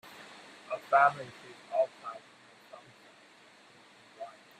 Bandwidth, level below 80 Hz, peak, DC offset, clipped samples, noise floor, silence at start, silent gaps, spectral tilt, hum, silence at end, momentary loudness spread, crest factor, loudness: 14 kHz; -86 dBFS; -12 dBFS; under 0.1%; under 0.1%; -58 dBFS; 0.2 s; none; -4 dB/octave; none; 0.3 s; 28 LU; 24 dB; -29 LUFS